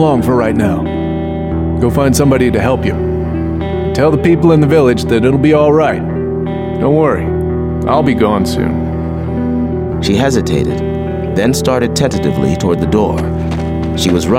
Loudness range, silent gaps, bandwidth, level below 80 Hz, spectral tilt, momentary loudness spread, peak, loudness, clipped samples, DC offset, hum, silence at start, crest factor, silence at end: 3 LU; none; 16 kHz; -28 dBFS; -6.5 dB/octave; 8 LU; 0 dBFS; -13 LUFS; under 0.1%; under 0.1%; none; 0 s; 12 dB; 0 s